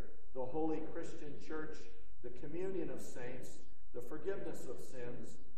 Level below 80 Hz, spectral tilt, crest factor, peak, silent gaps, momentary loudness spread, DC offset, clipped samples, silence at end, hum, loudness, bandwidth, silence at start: -64 dBFS; -6.5 dB/octave; 18 dB; -24 dBFS; none; 14 LU; 3%; under 0.1%; 0 s; none; -46 LUFS; 13 kHz; 0 s